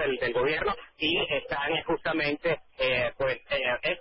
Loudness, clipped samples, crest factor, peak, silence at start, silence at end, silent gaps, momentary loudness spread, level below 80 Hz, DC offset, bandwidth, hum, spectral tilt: -28 LUFS; under 0.1%; 14 dB; -14 dBFS; 0 s; 0 s; none; 4 LU; -52 dBFS; under 0.1%; 5.8 kHz; none; -8.5 dB/octave